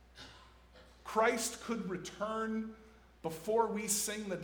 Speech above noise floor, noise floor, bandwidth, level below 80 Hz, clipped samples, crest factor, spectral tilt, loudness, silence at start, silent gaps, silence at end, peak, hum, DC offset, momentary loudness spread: 24 dB; -60 dBFS; over 20 kHz; -64 dBFS; under 0.1%; 20 dB; -3 dB/octave; -36 LUFS; 0.15 s; none; 0 s; -16 dBFS; none; under 0.1%; 19 LU